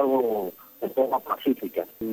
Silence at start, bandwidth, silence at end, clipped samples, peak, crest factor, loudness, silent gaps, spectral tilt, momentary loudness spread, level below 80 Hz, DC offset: 0 s; over 20 kHz; 0 s; under 0.1%; -10 dBFS; 16 dB; -27 LUFS; none; -6.5 dB/octave; 9 LU; -68 dBFS; under 0.1%